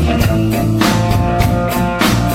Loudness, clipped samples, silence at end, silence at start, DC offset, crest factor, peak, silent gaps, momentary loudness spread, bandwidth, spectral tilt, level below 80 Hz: -14 LUFS; under 0.1%; 0 s; 0 s; under 0.1%; 14 dB; 0 dBFS; none; 2 LU; 16.5 kHz; -6 dB/octave; -24 dBFS